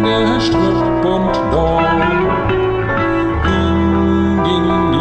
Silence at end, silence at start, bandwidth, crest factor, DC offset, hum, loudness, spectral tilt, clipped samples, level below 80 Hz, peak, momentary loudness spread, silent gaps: 0 s; 0 s; 8.6 kHz; 10 dB; under 0.1%; none; -14 LUFS; -7 dB/octave; under 0.1%; -26 dBFS; -2 dBFS; 2 LU; none